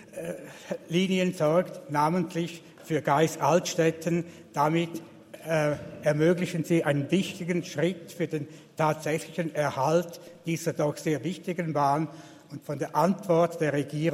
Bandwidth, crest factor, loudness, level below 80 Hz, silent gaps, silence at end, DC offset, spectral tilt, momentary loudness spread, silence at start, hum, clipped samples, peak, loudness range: 16 kHz; 18 dB; -28 LUFS; -68 dBFS; none; 0 s; under 0.1%; -6 dB/octave; 13 LU; 0 s; none; under 0.1%; -10 dBFS; 3 LU